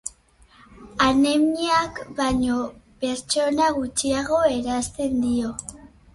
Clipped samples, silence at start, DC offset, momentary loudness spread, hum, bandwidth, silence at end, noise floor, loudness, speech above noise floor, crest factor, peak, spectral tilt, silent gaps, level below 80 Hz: under 0.1%; 0.05 s; under 0.1%; 11 LU; none; 11.5 kHz; 0.3 s; -54 dBFS; -22 LUFS; 33 dB; 16 dB; -6 dBFS; -3.5 dB/octave; none; -46 dBFS